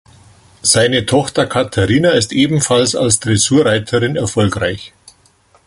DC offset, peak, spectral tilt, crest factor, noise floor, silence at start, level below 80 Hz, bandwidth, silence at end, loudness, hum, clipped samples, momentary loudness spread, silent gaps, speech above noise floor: under 0.1%; 0 dBFS; -4 dB/octave; 14 dB; -52 dBFS; 0.65 s; -40 dBFS; 12 kHz; 0.8 s; -13 LUFS; none; under 0.1%; 5 LU; none; 38 dB